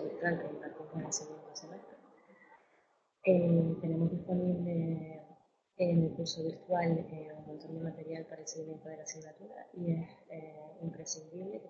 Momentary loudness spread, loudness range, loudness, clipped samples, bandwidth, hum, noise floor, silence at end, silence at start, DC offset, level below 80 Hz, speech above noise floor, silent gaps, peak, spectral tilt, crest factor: 18 LU; 9 LU; -36 LUFS; under 0.1%; 7.6 kHz; none; -72 dBFS; 0 s; 0 s; under 0.1%; -72 dBFS; 37 dB; none; -16 dBFS; -7 dB/octave; 22 dB